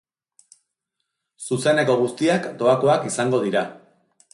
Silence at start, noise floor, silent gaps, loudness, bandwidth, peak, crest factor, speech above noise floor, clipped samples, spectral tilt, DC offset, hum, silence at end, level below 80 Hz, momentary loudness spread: 1.4 s; -79 dBFS; none; -20 LUFS; 11.5 kHz; -6 dBFS; 16 dB; 59 dB; under 0.1%; -5 dB/octave; under 0.1%; none; 0.55 s; -66 dBFS; 8 LU